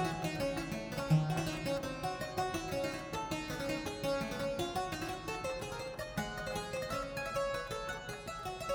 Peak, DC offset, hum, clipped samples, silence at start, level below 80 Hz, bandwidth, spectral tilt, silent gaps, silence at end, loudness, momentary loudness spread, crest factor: -18 dBFS; under 0.1%; none; under 0.1%; 0 s; -54 dBFS; over 20 kHz; -5 dB/octave; none; 0 s; -38 LUFS; 5 LU; 18 dB